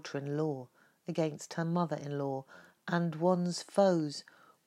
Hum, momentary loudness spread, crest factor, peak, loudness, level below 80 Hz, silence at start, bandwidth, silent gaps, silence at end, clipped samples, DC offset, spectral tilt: none; 13 LU; 20 dB; -14 dBFS; -33 LUFS; -88 dBFS; 0.05 s; 12 kHz; none; 0.45 s; under 0.1%; under 0.1%; -6.5 dB/octave